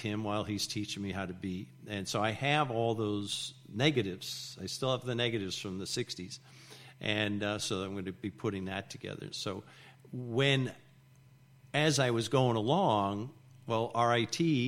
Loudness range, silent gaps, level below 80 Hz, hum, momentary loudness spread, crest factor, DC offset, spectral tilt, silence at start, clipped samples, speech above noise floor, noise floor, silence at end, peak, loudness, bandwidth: 6 LU; none; -68 dBFS; none; 13 LU; 22 dB; under 0.1%; -4.5 dB/octave; 0 s; under 0.1%; 27 dB; -60 dBFS; 0 s; -12 dBFS; -33 LUFS; 15.5 kHz